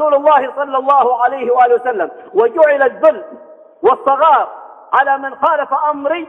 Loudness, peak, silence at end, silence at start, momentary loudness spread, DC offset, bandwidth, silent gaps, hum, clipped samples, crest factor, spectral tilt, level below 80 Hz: -13 LUFS; 0 dBFS; 0.05 s; 0 s; 7 LU; under 0.1%; 3.9 kHz; none; none; under 0.1%; 14 dB; -5.5 dB/octave; -66 dBFS